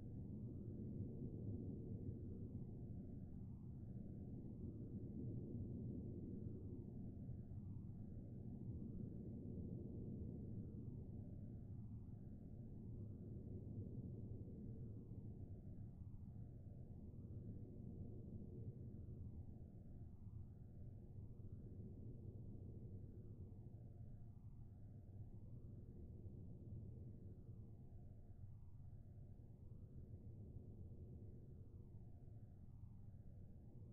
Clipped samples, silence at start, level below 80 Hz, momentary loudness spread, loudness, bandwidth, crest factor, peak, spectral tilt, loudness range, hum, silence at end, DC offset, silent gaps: under 0.1%; 0 s; -62 dBFS; 9 LU; -56 LUFS; 1.8 kHz; 16 dB; -38 dBFS; -14.5 dB/octave; 7 LU; none; 0 s; under 0.1%; none